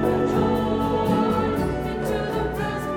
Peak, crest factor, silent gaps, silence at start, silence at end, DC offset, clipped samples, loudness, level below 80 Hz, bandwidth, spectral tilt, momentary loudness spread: -8 dBFS; 14 dB; none; 0 s; 0 s; under 0.1%; under 0.1%; -23 LUFS; -38 dBFS; 18.5 kHz; -7 dB/octave; 5 LU